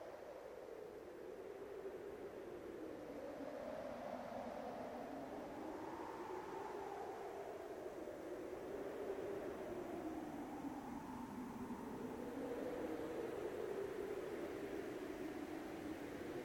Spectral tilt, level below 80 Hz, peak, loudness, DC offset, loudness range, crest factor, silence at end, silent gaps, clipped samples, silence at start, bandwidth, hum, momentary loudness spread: -6 dB/octave; -72 dBFS; -34 dBFS; -49 LUFS; under 0.1%; 4 LU; 14 dB; 0 s; none; under 0.1%; 0 s; 17 kHz; none; 6 LU